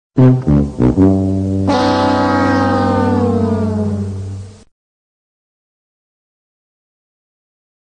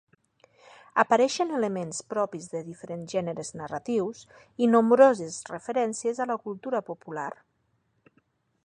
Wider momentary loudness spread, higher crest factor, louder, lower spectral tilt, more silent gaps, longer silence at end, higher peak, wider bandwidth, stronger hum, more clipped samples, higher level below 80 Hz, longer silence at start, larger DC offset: second, 10 LU vs 17 LU; second, 14 dB vs 22 dB; first, -14 LUFS vs -27 LUFS; first, -8 dB/octave vs -5 dB/octave; neither; first, 3.4 s vs 1.35 s; about the same, -2 dBFS vs -4 dBFS; about the same, 9.6 kHz vs 10.5 kHz; neither; neither; first, -34 dBFS vs -74 dBFS; second, 0.15 s vs 0.95 s; neither